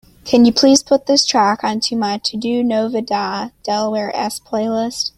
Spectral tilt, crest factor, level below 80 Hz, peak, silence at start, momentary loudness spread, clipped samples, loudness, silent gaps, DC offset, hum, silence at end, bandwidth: -3.5 dB/octave; 16 dB; -54 dBFS; 0 dBFS; 0.25 s; 10 LU; under 0.1%; -16 LUFS; none; under 0.1%; none; 0.1 s; 14.5 kHz